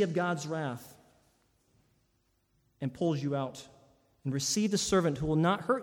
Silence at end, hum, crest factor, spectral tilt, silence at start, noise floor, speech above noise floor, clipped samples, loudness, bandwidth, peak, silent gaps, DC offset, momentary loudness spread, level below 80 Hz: 0 s; none; 18 dB; -5 dB/octave; 0 s; -74 dBFS; 43 dB; under 0.1%; -31 LUFS; 18.5 kHz; -16 dBFS; none; under 0.1%; 12 LU; -60 dBFS